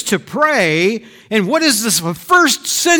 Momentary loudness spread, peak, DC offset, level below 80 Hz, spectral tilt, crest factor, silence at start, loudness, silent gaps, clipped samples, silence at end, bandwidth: 7 LU; -2 dBFS; under 0.1%; -56 dBFS; -2.5 dB/octave; 12 dB; 0 s; -14 LUFS; none; under 0.1%; 0 s; 19.5 kHz